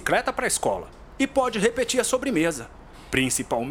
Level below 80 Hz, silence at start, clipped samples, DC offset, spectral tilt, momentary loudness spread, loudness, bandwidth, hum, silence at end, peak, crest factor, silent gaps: -48 dBFS; 0 s; under 0.1%; under 0.1%; -3 dB/octave; 9 LU; -24 LUFS; 17.5 kHz; none; 0 s; -4 dBFS; 20 dB; none